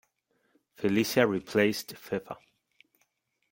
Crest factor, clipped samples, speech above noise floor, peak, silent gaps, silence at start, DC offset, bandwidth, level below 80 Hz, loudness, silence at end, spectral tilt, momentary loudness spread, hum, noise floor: 24 dB; under 0.1%; 47 dB; -8 dBFS; none; 0.8 s; under 0.1%; 17 kHz; -70 dBFS; -28 LUFS; 1.15 s; -5 dB/octave; 13 LU; none; -75 dBFS